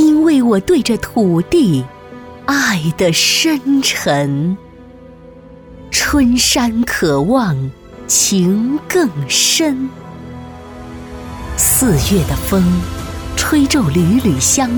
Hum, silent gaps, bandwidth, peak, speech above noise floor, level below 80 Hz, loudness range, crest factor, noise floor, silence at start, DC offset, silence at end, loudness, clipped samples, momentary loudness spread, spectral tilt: none; none; over 20 kHz; -2 dBFS; 24 dB; -32 dBFS; 3 LU; 14 dB; -37 dBFS; 0 s; under 0.1%; 0 s; -13 LUFS; under 0.1%; 19 LU; -4 dB/octave